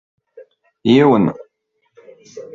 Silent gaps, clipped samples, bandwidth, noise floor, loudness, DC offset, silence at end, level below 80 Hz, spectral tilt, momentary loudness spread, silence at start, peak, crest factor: none; under 0.1%; 7.4 kHz; -68 dBFS; -14 LUFS; under 0.1%; 0.1 s; -58 dBFS; -7.5 dB/octave; 25 LU; 0.85 s; -2 dBFS; 16 dB